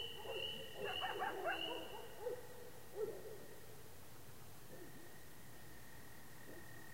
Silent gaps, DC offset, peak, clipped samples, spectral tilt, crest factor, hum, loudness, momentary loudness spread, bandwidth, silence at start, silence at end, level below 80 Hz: none; 0.2%; -30 dBFS; under 0.1%; -3 dB/octave; 20 dB; none; -48 LUFS; 16 LU; 16 kHz; 0 s; 0 s; -72 dBFS